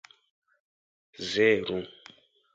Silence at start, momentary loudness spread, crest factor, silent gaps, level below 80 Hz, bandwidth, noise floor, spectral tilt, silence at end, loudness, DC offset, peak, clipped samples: 1.2 s; 15 LU; 22 dB; none; -66 dBFS; 7.8 kHz; -56 dBFS; -4.5 dB/octave; 0.65 s; -27 LUFS; under 0.1%; -10 dBFS; under 0.1%